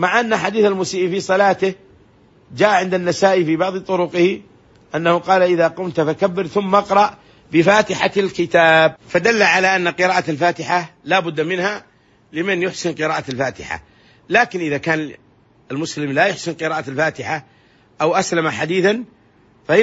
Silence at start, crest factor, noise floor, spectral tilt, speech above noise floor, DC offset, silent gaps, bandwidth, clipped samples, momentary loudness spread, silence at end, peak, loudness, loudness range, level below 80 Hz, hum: 0 s; 18 dB; -52 dBFS; -4.5 dB/octave; 35 dB; under 0.1%; none; 8 kHz; under 0.1%; 11 LU; 0 s; 0 dBFS; -17 LUFS; 6 LU; -58 dBFS; none